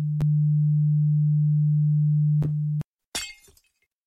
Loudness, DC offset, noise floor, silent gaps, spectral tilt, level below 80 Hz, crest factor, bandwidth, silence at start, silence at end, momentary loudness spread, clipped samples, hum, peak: -23 LUFS; under 0.1%; -66 dBFS; 2.85-2.95 s, 3.06-3.12 s; -7 dB/octave; -54 dBFS; 6 dB; 11 kHz; 0 s; 0.75 s; 11 LU; under 0.1%; none; -16 dBFS